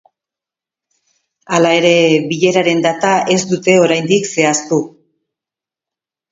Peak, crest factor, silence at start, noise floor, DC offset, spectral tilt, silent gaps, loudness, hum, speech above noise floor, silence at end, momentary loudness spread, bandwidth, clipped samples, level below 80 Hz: 0 dBFS; 16 dB; 1.5 s; -87 dBFS; under 0.1%; -4 dB/octave; none; -13 LUFS; none; 75 dB; 1.45 s; 7 LU; 7.8 kHz; under 0.1%; -62 dBFS